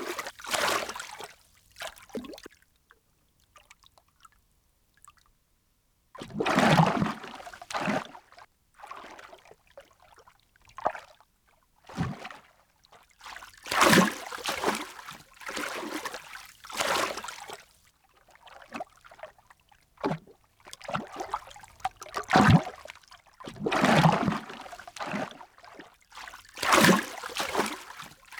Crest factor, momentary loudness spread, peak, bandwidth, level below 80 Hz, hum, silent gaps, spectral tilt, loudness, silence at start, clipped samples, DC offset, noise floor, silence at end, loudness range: 26 dB; 25 LU; -4 dBFS; over 20 kHz; -58 dBFS; none; none; -4.5 dB/octave; -27 LUFS; 0 s; under 0.1%; under 0.1%; -70 dBFS; 0 s; 16 LU